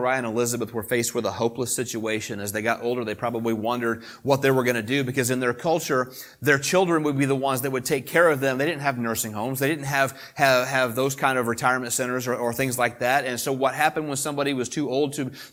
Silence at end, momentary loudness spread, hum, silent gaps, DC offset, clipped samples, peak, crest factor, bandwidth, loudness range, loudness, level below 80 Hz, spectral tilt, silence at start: 0.05 s; 7 LU; none; none; under 0.1%; under 0.1%; -2 dBFS; 22 dB; 19 kHz; 3 LU; -24 LUFS; -64 dBFS; -4 dB/octave; 0 s